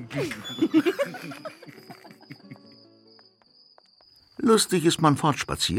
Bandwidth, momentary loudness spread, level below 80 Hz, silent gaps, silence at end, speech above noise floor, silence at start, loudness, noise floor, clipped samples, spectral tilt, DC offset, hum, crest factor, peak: 16.5 kHz; 26 LU; -56 dBFS; none; 0 s; 35 dB; 0 s; -23 LUFS; -59 dBFS; under 0.1%; -4.5 dB/octave; under 0.1%; none; 20 dB; -6 dBFS